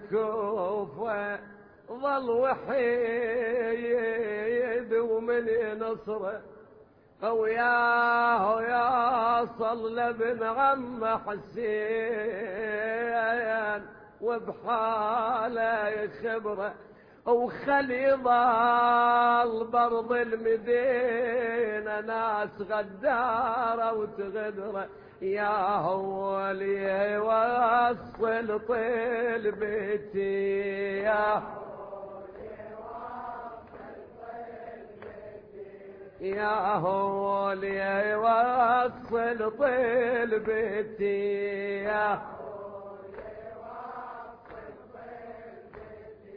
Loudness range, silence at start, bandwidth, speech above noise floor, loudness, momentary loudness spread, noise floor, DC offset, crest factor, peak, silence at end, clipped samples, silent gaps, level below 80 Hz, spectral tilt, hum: 10 LU; 0 s; 5.2 kHz; 29 dB; -28 LUFS; 19 LU; -56 dBFS; under 0.1%; 16 dB; -14 dBFS; 0 s; under 0.1%; none; -64 dBFS; -8.5 dB/octave; none